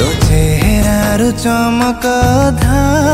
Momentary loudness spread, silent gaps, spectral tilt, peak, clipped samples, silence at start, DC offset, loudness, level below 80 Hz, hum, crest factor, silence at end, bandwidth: 2 LU; none; -5.5 dB/octave; 0 dBFS; under 0.1%; 0 s; under 0.1%; -12 LUFS; -18 dBFS; none; 10 dB; 0 s; 16.5 kHz